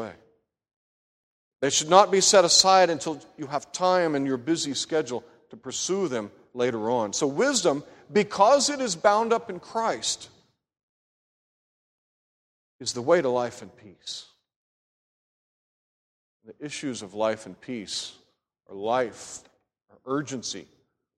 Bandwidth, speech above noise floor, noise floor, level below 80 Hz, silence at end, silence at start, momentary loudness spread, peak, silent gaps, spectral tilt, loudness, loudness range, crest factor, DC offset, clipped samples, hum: 15.5 kHz; 40 dB; -65 dBFS; -70 dBFS; 0.55 s; 0 s; 19 LU; -2 dBFS; 0.76-1.51 s, 10.83-12.79 s, 14.56-16.40 s; -2.5 dB/octave; -24 LUFS; 14 LU; 24 dB; under 0.1%; under 0.1%; none